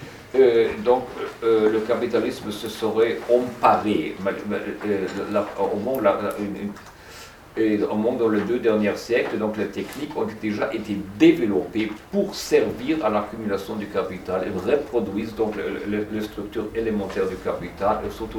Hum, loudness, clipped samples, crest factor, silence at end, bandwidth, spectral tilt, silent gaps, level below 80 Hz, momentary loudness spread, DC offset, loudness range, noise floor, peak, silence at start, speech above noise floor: none; -23 LUFS; under 0.1%; 18 dB; 0 s; 19 kHz; -6 dB/octave; none; -50 dBFS; 10 LU; under 0.1%; 4 LU; -43 dBFS; -4 dBFS; 0 s; 20 dB